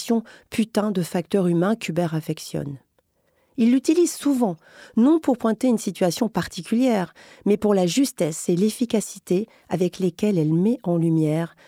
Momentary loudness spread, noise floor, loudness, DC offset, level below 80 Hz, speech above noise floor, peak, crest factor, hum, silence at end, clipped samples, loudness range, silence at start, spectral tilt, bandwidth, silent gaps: 9 LU; -67 dBFS; -22 LUFS; under 0.1%; -62 dBFS; 45 dB; -6 dBFS; 16 dB; none; 0.2 s; under 0.1%; 3 LU; 0 s; -6 dB/octave; 16.5 kHz; none